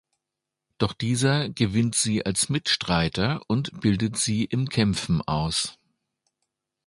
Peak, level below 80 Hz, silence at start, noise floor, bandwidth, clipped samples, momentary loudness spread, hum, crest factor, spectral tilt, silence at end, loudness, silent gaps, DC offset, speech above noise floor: -6 dBFS; -48 dBFS; 0.8 s; -86 dBFS; 11.5 kHz; under 0.1%; 5 LU; none; 20 dB; -4.5 dB/octave; 1.15 s; -24 LUFS; none; under 0.1%; 61 dB